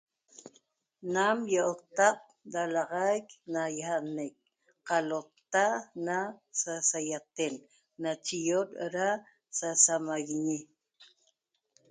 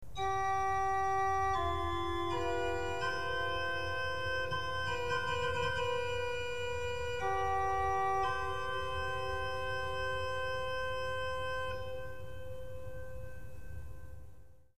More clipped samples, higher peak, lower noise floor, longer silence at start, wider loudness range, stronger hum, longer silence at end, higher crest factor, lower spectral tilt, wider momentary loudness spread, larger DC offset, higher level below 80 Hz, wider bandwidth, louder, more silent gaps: neither; first, -8 dBFS vs -22 dBFS; first, -76 dBFS vs -56 dBFS; first, 0.45 s vs 0 s; second, 3 LU vs 6 LU; neither; first, 0.85 s vs 0 s; first, 24 dB vs 14 dB; second, -2.5 dB/octave vs -4.5 dB/octave; second, 11 LU vs 15 LU; second, under 0.1% vs 0.8%; second, -82 dBFS vs -50 dBFS; second, 9.6 kHz vs 15.5 kHz; first, -31 LUFS vs -35 LUFS; neither